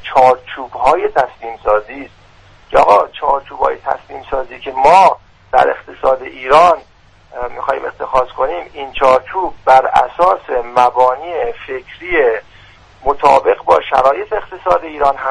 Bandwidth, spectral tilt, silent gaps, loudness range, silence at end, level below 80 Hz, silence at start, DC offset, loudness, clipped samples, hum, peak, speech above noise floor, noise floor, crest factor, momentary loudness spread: 11 kHz; -4.5 dB/octave; none; 3 LU; 0 s; -40 dBFS; 0 s; under 0.1%; -13 LUFS; under 0.1%; none; 0 dBFS; 30 dB; -43 dBFS; 14 dB; 14 LU